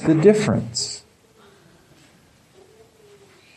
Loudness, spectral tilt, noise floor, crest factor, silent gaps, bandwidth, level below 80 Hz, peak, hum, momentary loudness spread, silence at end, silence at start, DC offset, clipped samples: -19 LUFS; -5.5 dB/octave; -54 dBFS; 22 dB; none; 12 kHz; -56 dBFS; -2 dBFS; none; 14 LU; 2.6 s; 0 s; under 0.1%; under 0.1%